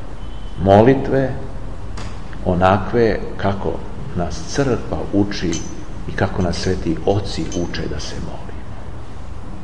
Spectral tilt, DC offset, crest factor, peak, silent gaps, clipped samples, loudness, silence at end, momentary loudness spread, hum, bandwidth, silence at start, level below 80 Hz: -6.5 dB/octave; 5%; 20 dB; 0 dBFS; none; under 0.1%; -19 LUFS; 0 s; 19 LU; none; 11 kHz; 0 s; -32 dBFS